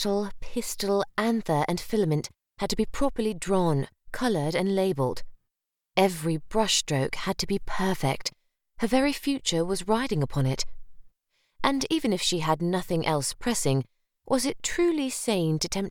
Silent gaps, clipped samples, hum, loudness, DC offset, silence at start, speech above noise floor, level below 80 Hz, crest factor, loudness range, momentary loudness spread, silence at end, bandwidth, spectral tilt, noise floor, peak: none; under 0.1%; none; -27 LUFS; under 0.1%; 0 s; 58 dB; -46 dBFS; 22 dB; 1 LU; 6 LU; 0 s; 18 kHz; -4.5 dB/octave; -84 dBFS; -6 dBFS